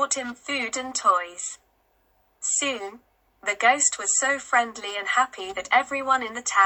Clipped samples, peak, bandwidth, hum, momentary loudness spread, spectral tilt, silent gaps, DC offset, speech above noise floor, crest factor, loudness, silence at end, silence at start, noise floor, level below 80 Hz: under 0.1%; -6 dBFS; 19 kHz; none; 12 LU; 1 dB/octave; none; under 0.1%; 41 dB; 20 dB; -24 LUFS; 0 s; 0 s; -66 dBFS; -68 dBFS